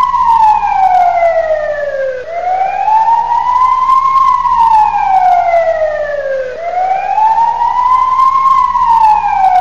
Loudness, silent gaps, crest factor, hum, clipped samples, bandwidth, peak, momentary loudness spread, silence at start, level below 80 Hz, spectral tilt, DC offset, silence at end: -10 LUFS; none; 10 dB; 60 Hz at -45 dBFS; under 0.1%; 7.6 kHz; 0 dBFS; 8 LU; 0 s; -40 dBFS; -3.5 dB/octave; 2%; 0 s